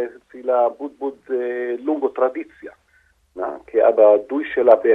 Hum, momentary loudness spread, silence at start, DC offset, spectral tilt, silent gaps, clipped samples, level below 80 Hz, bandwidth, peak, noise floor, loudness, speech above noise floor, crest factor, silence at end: none; 15 LU; 0 s; under 0.1%; -6.5 dB/octave; none; under 0.1%; -64 dBFS; 3.9 kHz; 0 dBFS; -59 dBFS; -19 LUFS; 41 dB; 20 dB; 0 s